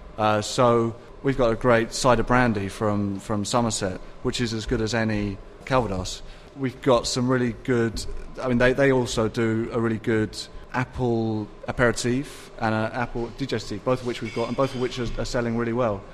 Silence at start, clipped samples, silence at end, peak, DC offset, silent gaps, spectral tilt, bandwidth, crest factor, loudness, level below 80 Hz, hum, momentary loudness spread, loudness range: 0 s; under 0.1%; 0 s; -4 dBFS; under 0.1%; none; -5.5 dB/octave; 14 kHz; 20 dB; -24 LUFS; -40 dBFS; none; 10 LU; 4 LU